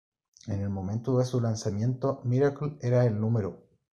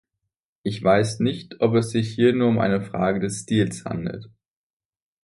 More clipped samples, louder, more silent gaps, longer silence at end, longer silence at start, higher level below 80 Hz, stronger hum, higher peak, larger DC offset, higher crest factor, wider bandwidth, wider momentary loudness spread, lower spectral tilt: neither; second, -29 LUFS vs -22 LUFS; neither; second, 0.35 s vs 0.95 s; second, 0.45 s vs 0.65 s; second, -62 dBFS vs -54 dBFS; neither; second, -12 dBFS vs -4 dBFS; neither; about the same, 16 dB vs 18 dB; second, 8.6 kHz vs 11.5 kHz; second, 8 LU vs 11 LU; first, -8 dB/octave vs -6 dB/octave